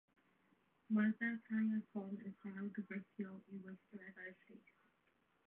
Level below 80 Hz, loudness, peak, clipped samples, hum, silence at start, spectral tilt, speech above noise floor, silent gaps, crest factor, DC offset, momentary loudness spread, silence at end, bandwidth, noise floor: under -90 dBFS; -43 LUFS; -28 dBFS; under 0.1%; none; 0.9 s; -7 dB/octave; 36 dB; none; 18 dB; under 0.1%; 17 LU; 0.9 s; 3.7 kHz; -79 dBFS